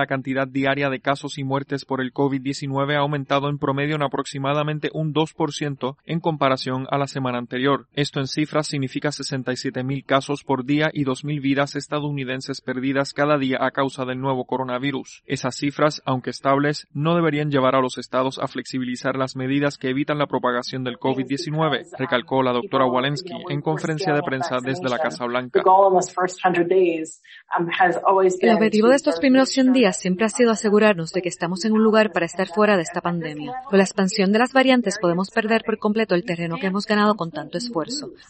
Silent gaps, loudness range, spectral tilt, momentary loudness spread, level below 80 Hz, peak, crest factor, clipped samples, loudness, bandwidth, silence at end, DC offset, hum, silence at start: none; 5 LU; -5.5 dB/octave; 9 LU; -62 dBFS; -4 dBFS; 18 dB; under 0.1%; -21 LUFS; 8.8 kHz; 0.15 s; under 0.1%; none; 0 s